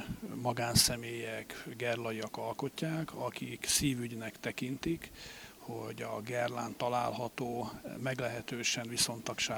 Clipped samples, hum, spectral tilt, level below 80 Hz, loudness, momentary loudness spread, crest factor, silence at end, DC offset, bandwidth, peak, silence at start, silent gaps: under 0.1%; none; -3 dB/octave; -58 dBFS; -35 LUFS; 12 LU; 24 dB; 0 s; under 0.1%; over 20 kHz; -12 dBFS; 0 s; none